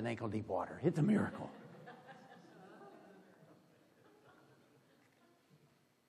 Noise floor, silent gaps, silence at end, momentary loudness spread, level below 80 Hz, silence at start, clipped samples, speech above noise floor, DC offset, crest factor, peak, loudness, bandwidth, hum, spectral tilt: -72 dBFS; none; 2.55 s; 25 LU; -80 dBFS; 0 s; under 0.1%; 35 dB; under 0.1%; 22 dB; -20 dBFS; -38 LUFS; 11.5 kHz; none; -8 dB/octave